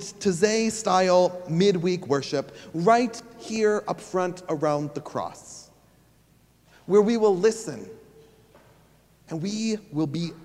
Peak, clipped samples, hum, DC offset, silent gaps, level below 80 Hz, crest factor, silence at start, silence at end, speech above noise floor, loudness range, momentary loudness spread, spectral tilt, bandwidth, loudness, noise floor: -6 dBFS; under 0.1%; none; under 0.1%; none; -64 dBFS; 20 dB; 0 s; 0 s; 36 dB; 6 LU; 16 LU; -5 dB/octave; 12.5 kHz; -24 LUFS; -60 dBFS